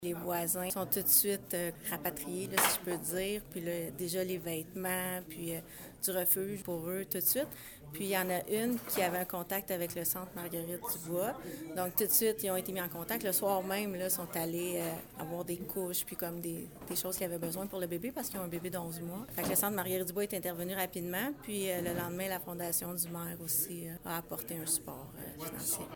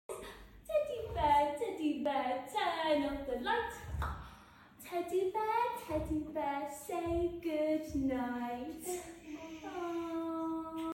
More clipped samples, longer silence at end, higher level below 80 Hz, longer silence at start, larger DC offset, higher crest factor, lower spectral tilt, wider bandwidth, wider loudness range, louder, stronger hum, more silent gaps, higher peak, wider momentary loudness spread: neither; about the same, 0 s vs 0 s; second, -64 dBFS vs -52 dBFS; about the same, 0 s vs 0.1 s; neither; first, 24 dB vs 18 dB; second, -3.5 dB/octave vs -5 dB/octave; first, 19 kHz vs 17 kHz; about the same, 5 LU vs 4 LU; about the same, -35 LUFS vs -36 LUFS; neither; neither; first, -12 dBFS vs -18 dBFS; about the same, 11 LU vs 13 LU